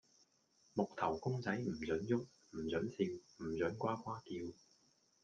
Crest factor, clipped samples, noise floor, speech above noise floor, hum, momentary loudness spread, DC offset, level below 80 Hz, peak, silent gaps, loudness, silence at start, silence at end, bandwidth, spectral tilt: 20 dB; under 0.1%; -75 dBFS; 34 dB; none; 9 LU; under 0.1%; -72 dBFS; -22 dBFS; none; -41 LUFS; 0.75 s; 0.7 s; 9 kHz; -7 dB/octave